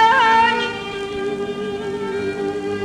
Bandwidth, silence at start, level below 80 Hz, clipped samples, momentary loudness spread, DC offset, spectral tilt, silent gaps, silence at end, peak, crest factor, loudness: 11 kHz; 0 s; -50 dBFS; under 0.1%; 12 LU; under 0.1%; -4 dB/octave; none; 0 s; -4 dBFS; 14 dB; -20 LUFS